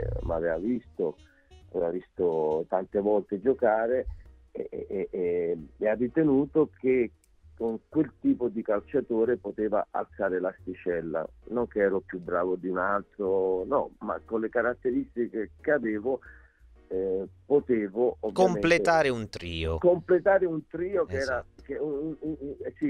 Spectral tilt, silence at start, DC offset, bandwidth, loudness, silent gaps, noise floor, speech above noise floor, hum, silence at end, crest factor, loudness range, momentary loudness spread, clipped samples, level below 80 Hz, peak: -7 dB/octave; 0 s; under 0.1%; 10 kHz; -28 LUFS; none; -56 dBFS; 28 dB; none; 0 s; 18 dB; 5 LU; 10 LU; under 0.1%; -50 dBFS; -10 dBFS